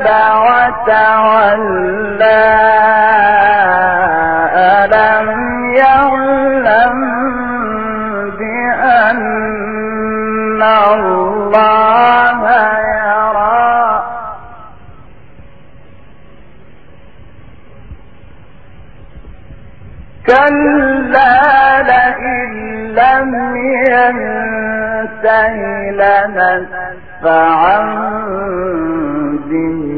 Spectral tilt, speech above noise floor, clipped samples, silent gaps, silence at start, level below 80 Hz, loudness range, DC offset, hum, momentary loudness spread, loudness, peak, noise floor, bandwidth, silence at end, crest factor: -7.5 dB/octave; 31 dB; under 0.1%; none; 0 s; -40 dBFS; 5 LU; 2%; none; 10 LU; -11 LUFS; 0 dBFS; -40 dBFS; 5 kHz; 0 s; 12 dB